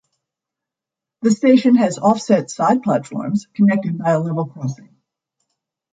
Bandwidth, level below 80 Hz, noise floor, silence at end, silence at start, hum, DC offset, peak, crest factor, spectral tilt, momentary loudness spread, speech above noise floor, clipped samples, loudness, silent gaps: 9.2 kHz; -64 dBFS; -86 dBFS; 1.2 s; 1.2 s; none; under 0.1%; -2 dBFS; 16 dB; -6.5 dB/octave; 11 LU; 70 dB; under 0.1%; -17 LUFS; none